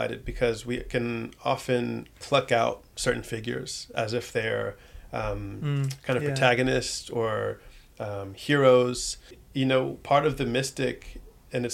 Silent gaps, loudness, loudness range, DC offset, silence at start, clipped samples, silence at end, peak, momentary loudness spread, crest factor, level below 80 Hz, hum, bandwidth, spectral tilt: none; -27 LUFS; 5 LU; under 0.1%; 0 s; under 0.1%; 0 s; -6 dBFS; 13 LU; 22 dB; -48 dBFS; none; 16 kHz; -5 dB/octave